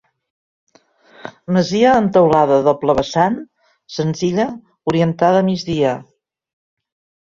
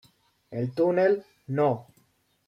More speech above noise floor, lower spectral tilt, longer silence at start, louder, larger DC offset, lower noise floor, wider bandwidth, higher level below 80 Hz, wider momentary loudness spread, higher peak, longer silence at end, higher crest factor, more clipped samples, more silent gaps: second, 36 dB vs 42 dB; second, -6.5 dB/octave vs -9 dB/octave; first, 1.25 s vs 0.5 s; first, -16 LUFS vs -26 LUFS; neither; second, -51 dBFS vs -66 dBFS; second, 7.6 kHz vs 10.5 kHz; first, -50 dBFS vs -72 dBFS; first, 15 LU vs 12 LU; first, -2 dBFS vs -12 dBFS; first, 1.2 s vs 0.65 s; about the same, 16 dB vs 16 dB; neither; neither